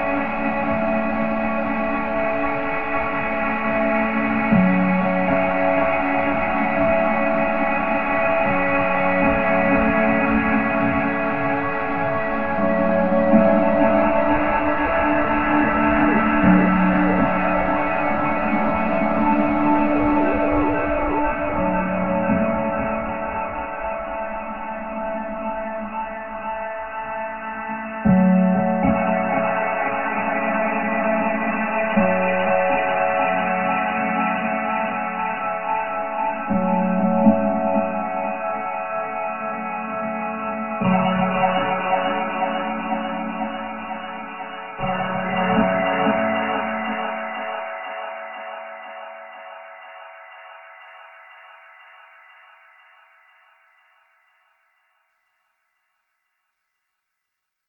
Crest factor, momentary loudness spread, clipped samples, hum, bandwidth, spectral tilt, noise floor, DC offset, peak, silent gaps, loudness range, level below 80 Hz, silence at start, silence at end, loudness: 20 dB; 11 LU; under 0.1%; none; 4.7 kHz; -10 dB/octave; -80 dBFS; 0.8%; -2 dBFS; none; 9 LU; -42 dBFS; 0 s; 0 s; -21 LUFS